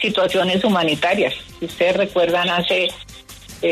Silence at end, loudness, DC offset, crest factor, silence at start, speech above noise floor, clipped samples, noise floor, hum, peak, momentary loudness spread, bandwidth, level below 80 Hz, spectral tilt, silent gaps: 0 s; -18 LUFS; under 0.1%; 12 dB; 0 s; 21 dB; under 0.1%; -39 dBFS; none; -6 dBFS; 17 LU; 13.5 kHz; -50 dBFS; -4.5 dB/octave; none